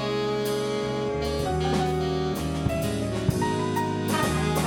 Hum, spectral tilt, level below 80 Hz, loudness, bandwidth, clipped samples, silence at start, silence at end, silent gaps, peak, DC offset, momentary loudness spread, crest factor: none; -5.5 dB/octave; -40 dBFS; -26 LUFS; 18 kHz; under 0.1%; 0 s; 0 s; none; -8 dBFS; under 0.1%; 3 LU; 18 dB